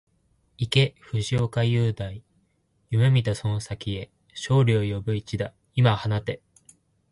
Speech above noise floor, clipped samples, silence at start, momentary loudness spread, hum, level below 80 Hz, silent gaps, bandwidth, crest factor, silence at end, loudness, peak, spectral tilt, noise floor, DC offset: 45 dB; under 0.1%; 0.6 s; 14 LU; none; -50 dBFS; none; 11.5 kHz; 20 dB; 0.75 s; -25 LUFS; -6 dBFS; -6.5 dB/octave; -68 dBFS; under 0.1%